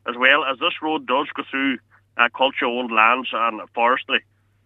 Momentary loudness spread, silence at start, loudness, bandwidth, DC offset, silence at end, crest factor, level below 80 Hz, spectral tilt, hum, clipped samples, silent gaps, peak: 8 LU; 0.05 s; -20 LUFS; 7.2 kHz; under 0.1%; 0.45 s; 20 dB; -74 dBFS; -5 dB/octave; none; under 0.1%; none; -2 dBFS